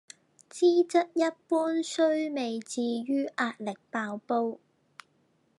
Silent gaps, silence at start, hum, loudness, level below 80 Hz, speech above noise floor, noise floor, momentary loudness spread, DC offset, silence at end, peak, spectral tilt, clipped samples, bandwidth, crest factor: none; 0.55 s; none; -29 LUFS; under -90 dBFS; 41 dB; -69 dBFS; 10 LU; under 0.1%; 1.05 s; -12 dBFS; -4 dB/octave; under 0.1%; 11.5 kHz; 18 dB